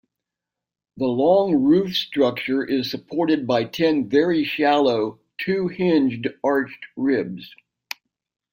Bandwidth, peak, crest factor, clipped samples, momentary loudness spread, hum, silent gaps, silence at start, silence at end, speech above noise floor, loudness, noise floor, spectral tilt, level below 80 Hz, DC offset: 16.5 kHz; -6 dBFS; 16 dB; under 0.1%; 12 LU; none; none; 0.95 s; 1.05 s; 67 dB; -21 LUFS; -87 dBFS; -6.5 dB/octave; -64 dBFS; under 0.1%